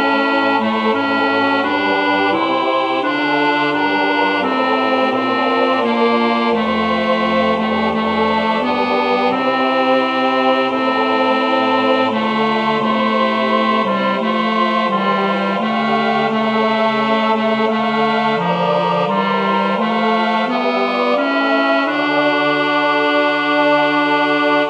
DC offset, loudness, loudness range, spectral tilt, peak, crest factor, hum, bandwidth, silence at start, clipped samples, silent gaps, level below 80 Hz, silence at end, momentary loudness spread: under 0.1%; -15 LUFS; 1 LU; -6 dB/octave; -2 dBFS; 12 dB; none; 9 kHz; 0 s; under 0.1%; none; -60 dBFS; 0 s; 2 LU